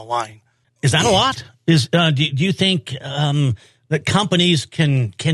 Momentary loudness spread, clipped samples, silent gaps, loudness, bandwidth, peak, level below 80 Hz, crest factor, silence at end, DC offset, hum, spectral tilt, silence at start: 10 LU; under 0.1%; none; -18 LUFS; 12.5 kHz; 0 dBFS; -52 dBFS; 18 dB; 0 s; under 0.1%; none; -5 dB/octave; 0 s